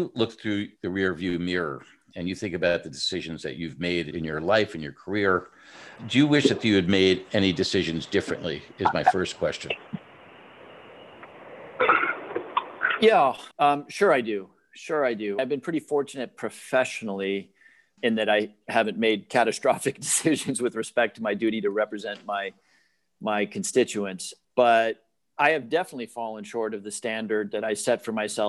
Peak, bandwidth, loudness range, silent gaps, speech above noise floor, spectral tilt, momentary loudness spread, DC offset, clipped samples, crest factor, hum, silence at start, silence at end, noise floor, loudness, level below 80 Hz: -4 dBFS; 12.5 kHz; 5 LU; none; 41 dB; -4 dB/octave; 13 LU; under 0.1%; under 0.1%; 22 dB; none; 0 s; 0 s; -67 dBFS; -25 LUFS; -62 dBFS